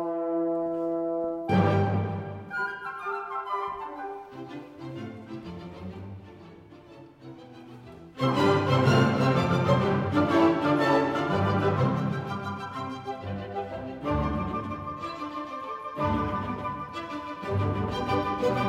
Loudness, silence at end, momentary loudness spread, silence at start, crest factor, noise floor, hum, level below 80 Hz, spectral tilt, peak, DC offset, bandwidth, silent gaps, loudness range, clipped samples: -27 LUFS; 0 s; 18 LU; 0 s; 18 dB; -49 dBFS; none; -50 dBFS; -7.5 dB/octave; -10 dBFS; under 0.1%; 13 kHz; none; 16 LU; under 0.1%